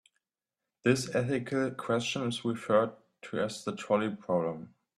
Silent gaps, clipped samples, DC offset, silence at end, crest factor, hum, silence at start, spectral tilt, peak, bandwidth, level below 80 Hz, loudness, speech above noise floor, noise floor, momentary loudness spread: none; under 0.1%; under 0.1%; 0.3 s; 20 dB; none; 0.85 s; -5.5 dB/octave; -12 dBFS; 13 kHz; -70 dBFS; -31 LUFS; over 59 dB; under -90 dBFS; 9 LU